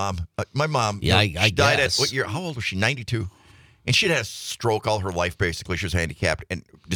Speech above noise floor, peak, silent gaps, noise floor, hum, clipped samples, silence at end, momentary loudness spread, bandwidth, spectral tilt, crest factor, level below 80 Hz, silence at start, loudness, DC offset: 29 dB; -2 dBFS; none; -53 dBFS; none; under 0.1%; 0 s; 11 LU; 19.5 kHz; -4 dB/octave; 20 dB; -46 dBFS; 0 s; -23 LUFS; under 0.1%